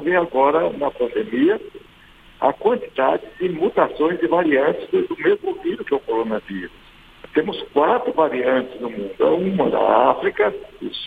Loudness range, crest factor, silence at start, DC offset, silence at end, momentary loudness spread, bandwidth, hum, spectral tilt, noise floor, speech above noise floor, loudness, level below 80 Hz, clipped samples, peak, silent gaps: 3 LU; 20 dB; 0 s; under 0.1%; 0 s; 9 LU; 4.8 kHz; none; -7.5 dB/octave; -48 dBFS; 28 dB; -20 LUFS; -54 dBFS; under 0.1%; 0 dBFS; none